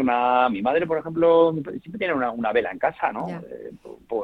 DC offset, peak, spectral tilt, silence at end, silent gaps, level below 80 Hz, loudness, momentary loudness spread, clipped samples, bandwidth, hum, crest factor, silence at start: under 0.1%; -6 dBFS; -8 dB/octave; 0 s; none; -58 dBFS; -22 LUFS; 16 LU; under 0.1%; 4.6 kHz; none; 18 dB; 0 s